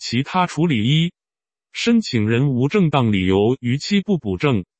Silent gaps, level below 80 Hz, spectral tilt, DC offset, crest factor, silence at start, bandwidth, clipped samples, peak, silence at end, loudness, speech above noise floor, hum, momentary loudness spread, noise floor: none; -52 dBFS; -6.5 dB/octave; under 0.1%; 18 dB; 0 s; 8.6 kHz; under 0.1%; -2 dBFS; 0.15 s; -19 LUFS; over 72 dB; none; 5 LU; under -90 dBFS